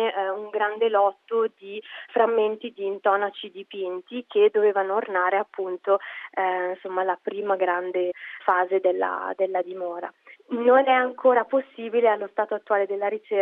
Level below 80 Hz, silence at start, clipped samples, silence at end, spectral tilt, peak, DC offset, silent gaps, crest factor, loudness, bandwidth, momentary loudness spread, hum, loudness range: -86 dBFS; 0 s; under 0.1%; 0 s; -7 dB/octave; -6 dBFS; under 0.1%; none; 18 dB; -24 LUFS; 4 kHz; 12 LU; none; 3 LU